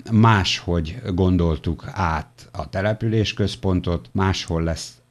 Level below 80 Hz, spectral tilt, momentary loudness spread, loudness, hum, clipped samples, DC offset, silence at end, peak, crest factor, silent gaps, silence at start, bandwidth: -36 dBFS; -6 dB/octave; 11 LU; -22 LUFS; none; under 0.1%; under 0.1%; 0.2 s; -4 dBFS; 16 dB; none; 0.05 s; 12 kHz